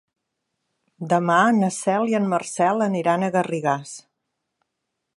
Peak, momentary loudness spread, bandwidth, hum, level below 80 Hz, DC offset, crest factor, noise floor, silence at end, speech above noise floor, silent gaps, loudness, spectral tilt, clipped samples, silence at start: -4 dBFS; 10 LU; 11.5 kHz; none; -74 dBFS; under 0.1%; 20 dB; -79 dBFS; 1.2 s; 59 dB; none; -21 LUFS; -5.5 dB/octave; under 0.1%; 1 s